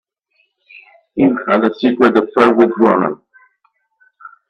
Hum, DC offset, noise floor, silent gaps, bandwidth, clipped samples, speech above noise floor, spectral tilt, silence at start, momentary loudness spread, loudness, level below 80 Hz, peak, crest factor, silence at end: none; under 0.1%; -63 dBFS; none; 8 kHz; under 0.1%; 50 dB; -7.5 dB/octave; 1.15 s; 9 LU; -13 LUFS; -58 dBFS; 0 dBFS; 16 dB; 0.2 s